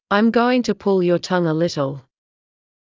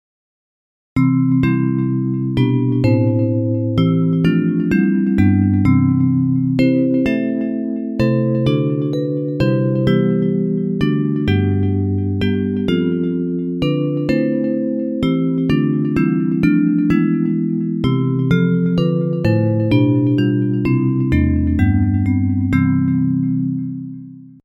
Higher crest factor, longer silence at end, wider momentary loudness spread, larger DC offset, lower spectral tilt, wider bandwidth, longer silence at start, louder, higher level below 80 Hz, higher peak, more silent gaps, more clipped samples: about the same, 16 dB vs 14 dB; first, 1 s vs 0.15 s; first, 9 LU vs 5 LU; neither; second, -6.5 dB/octave vs -9.5 dB/octave; about the same, 7.6 kHz vs 7.4 kHz; second, 0.1 s vs 0.95 s; about the same, -19 LUFS vs -17 LUFS; second, -60 dBFS vs -36 dBFS; about the same, -4 dBFS vs -2 dBFS; neither; neither